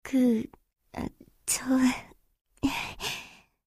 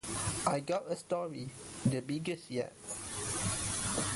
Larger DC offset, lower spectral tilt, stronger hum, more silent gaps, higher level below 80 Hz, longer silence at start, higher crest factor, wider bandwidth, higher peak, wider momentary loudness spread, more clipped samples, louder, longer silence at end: neither; about the same, -3.5 dB/octave vs -4 dB/octave; neither; first, 2.41-2.45 s vs none; about the same, -54 dBFS vs -56 dBFS; about the same, 0.05 s vs 0.05 s; second, 16 dB vs 22 dB; first, 15.5 kHz vs 12 kHz; about the same, -14 dBFS vs -14 dBFS; first, 16 LU vs 8 LU; neither; first, -29 LUFS vs -36 LUFS; first, 0.35 s vs 0 s